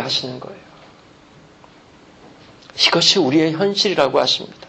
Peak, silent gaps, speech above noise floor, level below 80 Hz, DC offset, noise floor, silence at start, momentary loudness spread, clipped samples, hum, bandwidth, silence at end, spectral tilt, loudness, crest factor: -2 dBFS; none; 29 dB; -60 dBFS; under 0.1%; -47 dBFS; 0 s; 20 LU; under 0.1%; none; 8.6 kHz; 0 s; -3.5 dB/octave; -15 LUFS; 20 dB